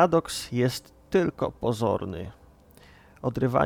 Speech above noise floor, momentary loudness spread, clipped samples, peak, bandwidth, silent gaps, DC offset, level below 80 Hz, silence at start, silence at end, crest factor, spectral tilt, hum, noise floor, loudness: 28 dB; 11 LU; under 0.1%; -6 dBFS; 20 kHz; none; under 0.1%; -52 dBFS; 0 s; 0 s; 20 dB; -6 dB/octave; none; -53 dBFS; -28 LUFS